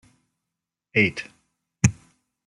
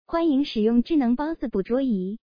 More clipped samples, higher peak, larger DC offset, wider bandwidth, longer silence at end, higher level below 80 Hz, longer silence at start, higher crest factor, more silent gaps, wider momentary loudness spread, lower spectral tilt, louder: neither; first, -2 dBFS vs -10 dBFS; neither; first, 11.5 kHz vs 5.2 kHz; first, 0.55 s vs 0.15 s; about the same, -52 dBFS vs -48 dBFS; first, 0.95 s vs 0.1 s; first, 24 dB vs 12 dB; neither; first, 15 LU vs 6 LU; second, -5 dB/octave vs -8.5 dB/octave; about the same, -23 LUFS vs -23 LUFS